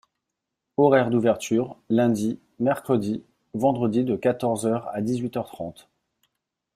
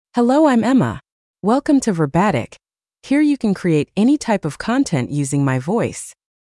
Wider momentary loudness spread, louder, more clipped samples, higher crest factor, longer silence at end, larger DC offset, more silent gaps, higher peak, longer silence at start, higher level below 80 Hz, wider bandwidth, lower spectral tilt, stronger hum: first, 13 LU vs 10 LU; second, -24 LUFS vs -17 LUFS; neither; first, 20 dB vs 14 dB; first, 1.05 s vs 0.35 s; neither; second, none vs 1.12-1.34 s; about the same, -6 dBFS vs -4 dBFS; first, 0.8 s vs 0.15 s; second, -64 dBFS vs -52 dBFS; first, 14.5 kHz vs 12 kHz; about the same, -6.5 dB/octave vs -6.5 dB/octave; neither